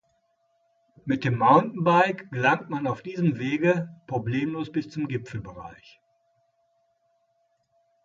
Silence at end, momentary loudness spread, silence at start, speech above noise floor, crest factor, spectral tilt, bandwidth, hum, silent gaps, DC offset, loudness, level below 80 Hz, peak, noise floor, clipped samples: 2.3 s; 17 LU; 1.05 s; 46 dB; 22 dB; -7.5 dB/octave; 7.4 kHz; none; none; under 0.1%; -25 LUFS; -62 dBFS; -6 dBFS; -71 dBFS; under 0.1%